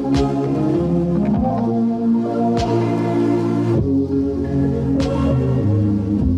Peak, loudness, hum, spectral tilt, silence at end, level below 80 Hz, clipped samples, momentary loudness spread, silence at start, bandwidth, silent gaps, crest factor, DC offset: -6 dBFS; -18 LUFS; none; -9 dB/octave; 0 s; -32 dBFS; under 0.1%; 2 LU; 0 s; 9.8 kHz; none; 12 dB; under 0.1%